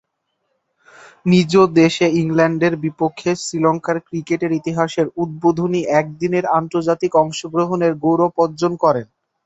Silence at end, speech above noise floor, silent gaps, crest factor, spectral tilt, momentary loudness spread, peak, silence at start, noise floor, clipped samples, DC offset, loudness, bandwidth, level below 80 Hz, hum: 0.4 s; 55 dB; none; 16 dB; -6 dB/octave; 8 LU; 0 dBFS; 1.25 s; -71 dBFS; under 0.1%; under 0.1%; -17 LUFS; 8.2 kHz; -58 dBFS; none